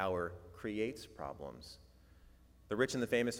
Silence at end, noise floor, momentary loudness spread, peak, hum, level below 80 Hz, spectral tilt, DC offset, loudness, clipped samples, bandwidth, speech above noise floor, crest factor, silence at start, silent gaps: 0 s; -62 dBFS; 18 LU; -18 dBFS; none; -64 dBFS; -5 dB/octave; under 0.1%; -39 LUFS; under 0.1%; 17 kHz; 24 dB; 22 dB; 0 s; none